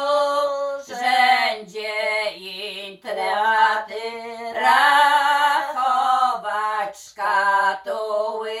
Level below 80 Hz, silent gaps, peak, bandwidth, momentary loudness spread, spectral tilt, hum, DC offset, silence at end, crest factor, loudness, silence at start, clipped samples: -72 dBFS; none; -4 dBFS; 14 kHz; 14 LU; -1 dB/octave; none; under 0.1%; 0 s; 16 dB; -20 LUFS; 0 s; under 0.1%